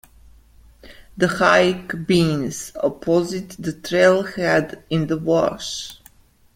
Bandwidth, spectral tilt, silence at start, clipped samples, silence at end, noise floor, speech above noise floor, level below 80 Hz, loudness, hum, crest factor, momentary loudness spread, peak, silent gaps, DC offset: 16.5 kHz; -5 dB/octave; 0.85 s; under 0.1%; 0.6 s; -52 dBFS; 32 dB; -50 dBFS; -20 LUFS; none; 20 dB; 13 LU; -2 dBFS; none; under 0.1%